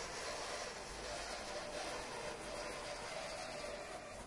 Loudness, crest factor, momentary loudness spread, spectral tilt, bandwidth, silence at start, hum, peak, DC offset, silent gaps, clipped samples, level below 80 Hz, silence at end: -45 LUFS; 14 dB; 3 LU; -2 dB/octave; 11.5 kHz; 0 s; none; -32 dBFS; under 0.1%; none; under 0.1%; -62 dBFS; 0 s